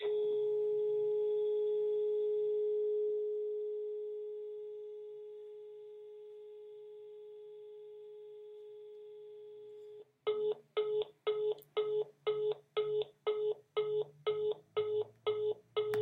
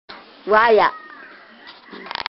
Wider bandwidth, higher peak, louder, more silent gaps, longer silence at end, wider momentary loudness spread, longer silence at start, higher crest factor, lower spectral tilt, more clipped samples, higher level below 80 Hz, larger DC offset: second, 4.2 kHz vs 6 kHz; second, -22 dBFS vs 0 dBFS; second, -37 LUFS vs -16 LUFS; neither; second, 0 s vs 0.15 s; second, 18 LU vs 25 LU; about the same, 0 s vs 0.1 s; about the same, 16 dB vs 20 dB; about the same, -5.5 dB/octave vs -6 dB/octave; neither; second, -88 dBFS vs -58 dBFS; neither